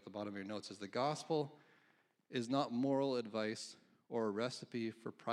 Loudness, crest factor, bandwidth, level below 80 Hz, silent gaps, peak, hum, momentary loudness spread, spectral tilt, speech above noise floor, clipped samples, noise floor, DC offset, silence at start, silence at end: -41 LUFS; 18 dB; 11.5 kHz; under -90 dBFS; none; -22 dBFS; none; 10 LU; -5.5 dB/octave; 35 dB; under 0.1%; -75 dBFS; under 0.1%; 0.05 s; 0 s